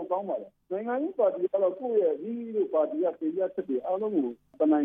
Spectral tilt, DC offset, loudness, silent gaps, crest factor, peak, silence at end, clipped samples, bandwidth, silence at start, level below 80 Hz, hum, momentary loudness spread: -10 dB/octave; under 0.1%; -29 LUFS; none; 14 dB; -14 dBFS; 0 s; under 0.1%; 3.6 kHz; 0 s; -78 dBFS; none; 8 LU